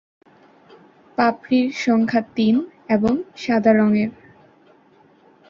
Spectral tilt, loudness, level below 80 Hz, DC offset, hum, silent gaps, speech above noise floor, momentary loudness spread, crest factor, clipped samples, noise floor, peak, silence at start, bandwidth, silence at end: -6.5 dB/octave; -19 LUFS; -58 dBFS; under 0.1%; none; none; 36 dB; 6 LU; 18 dB; under 0.1%; -54 dBFS; -2 dBFS; 1.2 s; 7.2 kHz; 1.35 s